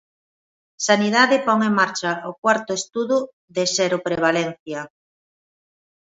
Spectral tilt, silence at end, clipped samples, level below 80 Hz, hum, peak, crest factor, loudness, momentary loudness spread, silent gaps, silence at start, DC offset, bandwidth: -3.5 dB/octave; 1.25 s; under 0.1%; -66 dBFS; none; -2 dBFS; 20 dB; -20 LUFS; 12 LU; 2.38-2.42 s, 3.33-3.48 s, 4.59-4.66 s; 0.8 s; under 0.1%; 8 kHz